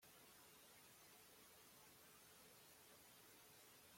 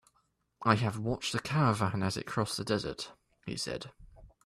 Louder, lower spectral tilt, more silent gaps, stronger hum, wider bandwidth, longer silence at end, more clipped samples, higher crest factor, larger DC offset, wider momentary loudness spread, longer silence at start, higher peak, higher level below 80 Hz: second, -65 LUFS vs -32 LUFS; second, -1.5 dB/octave vs -5 dB/octave; neither; neither; first, 16.5 kHz vs 14 kHz; second, 0 s vs 0.2 s; neither; second, 12 dB vs 22 dB; neither; second, 0 LU vs 14 LU; second, 0 s vs 0.6 s; second, -54 dBFS vs -10 dBFS; second, under -90 dBFS vs -60 dBFS